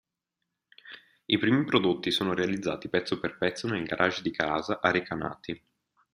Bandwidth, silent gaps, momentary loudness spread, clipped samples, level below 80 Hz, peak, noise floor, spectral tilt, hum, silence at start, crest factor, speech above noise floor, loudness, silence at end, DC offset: 15.5 kHz; none; 16 LU; under 0.1%; -64 dBFS; -6 dBFS; -85 dBFS; -5.5 dB/octave; none; 0.85 s; 24 dB; 57 dB; -28 LUFS; 0.55 s; under 0.1%